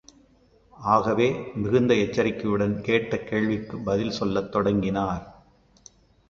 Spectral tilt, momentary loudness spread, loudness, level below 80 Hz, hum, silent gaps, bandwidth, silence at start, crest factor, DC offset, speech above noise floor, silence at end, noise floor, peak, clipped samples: -6.5 dB/octave; 7 LU; -25 LUFS; -50 dBFS; none; none; 7.4 kHz; 0.8 s; 20 dB; under 0.1%; 35 dB; 1 s; -59 dBFS; -6 dBFS; under 0.1%